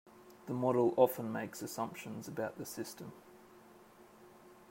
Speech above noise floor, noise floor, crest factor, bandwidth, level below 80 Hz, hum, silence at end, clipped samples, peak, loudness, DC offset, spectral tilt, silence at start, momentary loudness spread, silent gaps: 24 dB; -60 dBFS; 24 dB; 16 kHz; -80 dBFS; none; 0.05 s; under 0.1%; -14 dBFS; -36 LUFS; under 0.1%; -6 dB/octave; 0.05 s; 20 LU; none